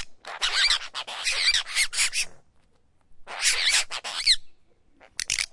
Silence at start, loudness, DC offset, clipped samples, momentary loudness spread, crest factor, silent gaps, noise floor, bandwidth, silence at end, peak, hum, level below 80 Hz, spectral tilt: 0 s; -23 LUFS; under 0.1%; under 0.1%; 12 LU; 20 dB; none; -61 dBFS; 11.5 kHz; 0.05 s; -6 dBFS; none; -52 dBFS; 3 dB/octave